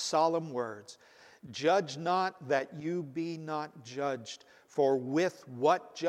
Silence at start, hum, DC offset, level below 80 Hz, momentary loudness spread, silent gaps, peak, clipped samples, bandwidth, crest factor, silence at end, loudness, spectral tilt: 0 s; none; under 0.1%; -84 dBFS; 12 LU; none; -14 dBFS; under 0.1%; 14 kHz; 18 dB; 0 s; -32 LUFS; -5 dB/octave